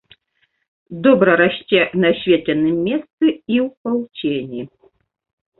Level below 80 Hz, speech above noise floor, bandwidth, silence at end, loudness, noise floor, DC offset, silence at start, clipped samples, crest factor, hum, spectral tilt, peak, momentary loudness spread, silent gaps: -58 dBFS; 49 dB; 4.2 kHz; 0.9 s; -17 LUFS; -66 dBFS; under 0.1%; 0.9 s; under 0.1%; 18 dB; none; -10.5 dB/octave; -2 dBFS; 11 LU; 3.13-3.18 s, 3.77-3.85 s